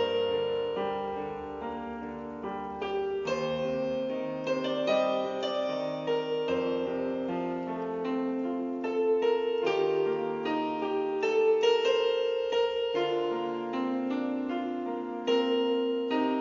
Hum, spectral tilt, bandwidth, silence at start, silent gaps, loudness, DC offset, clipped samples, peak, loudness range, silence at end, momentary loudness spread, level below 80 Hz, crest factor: none; -3 dB/octave; 7.4 kHz; 0 s; none; -30 LUFS; under 0.1%; under 0.1%; -14 dBFS; 5 LU; 0 s; 8 LU; -66 dBFS; 16 dB